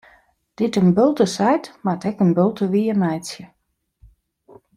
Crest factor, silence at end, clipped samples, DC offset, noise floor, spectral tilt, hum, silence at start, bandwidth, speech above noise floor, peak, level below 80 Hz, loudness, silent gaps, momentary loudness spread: 16 dB; 1.3 s; under 0.1%; under 0.1%; -72 dBFS; -7 dB/octave; none; 0.6 s; 12.5 kHz; 53 dB; -4 dBFS; -58 dBFS; -19 LUFS; none; 9 LU